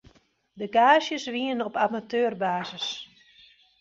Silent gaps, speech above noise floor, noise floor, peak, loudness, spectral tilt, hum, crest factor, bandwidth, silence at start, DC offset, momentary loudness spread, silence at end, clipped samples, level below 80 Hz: none; 35 dB; -60 dBFS; -4 dBFS; -25 LUFS; -4 dB/octave; none; 22 dB; 7.8 kHz; 0.55 s; under 0.1%; 15 LU; 0.75 s; under 0.1%; -70 dBFS